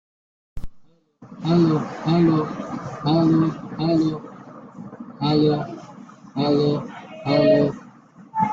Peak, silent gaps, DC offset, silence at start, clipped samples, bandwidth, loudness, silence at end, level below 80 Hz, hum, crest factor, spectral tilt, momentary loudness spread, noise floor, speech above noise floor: -6 dBFS; none; under 0.1%; 0.55 s; under 0.1%; 7.4 kHz; -21 LUFS; 0 s; -48 dBFS; none; 16 dB; -8.5 dB/octave; 22 LU; -50 dBFS; 30 dB